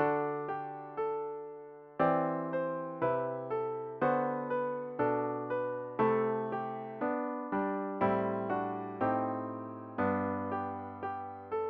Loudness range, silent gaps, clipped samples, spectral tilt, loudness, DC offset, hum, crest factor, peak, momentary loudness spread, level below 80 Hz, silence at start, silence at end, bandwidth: 2 LU; none; under 0.1%; -6.5 dB/octave; -34 LUFS; under 0.1%; none; 18 dB; -16 dBFS; 9 LU; -72 dBFS; 0 s; 0 s; 5 kHz